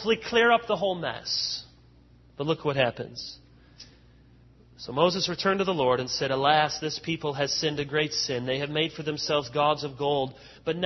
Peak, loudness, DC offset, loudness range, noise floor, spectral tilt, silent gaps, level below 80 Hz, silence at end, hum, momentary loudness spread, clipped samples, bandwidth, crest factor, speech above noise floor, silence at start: -6 dBFS; -26 LUFS; under 0.1%; 6 LU; -56 dBFS; -4 dB/octave; none; -58 dBFS; 0 s; none; 12 LU; under 0.1%; 6.2 kHz; 22 dB; 29 dB; 0 s